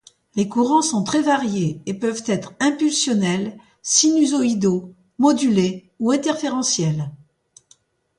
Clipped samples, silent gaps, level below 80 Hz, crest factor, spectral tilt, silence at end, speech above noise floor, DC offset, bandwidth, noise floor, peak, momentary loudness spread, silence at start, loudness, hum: under 0.1%; none; -62 dBFS; 20 dB; -4 dB/octave; 1.05 s; 39 dB; under 0.1%; 11.5 kHz; -58 dBFS; -2 dBFS; 9 LU; 0.35 s; -20 LUFS; none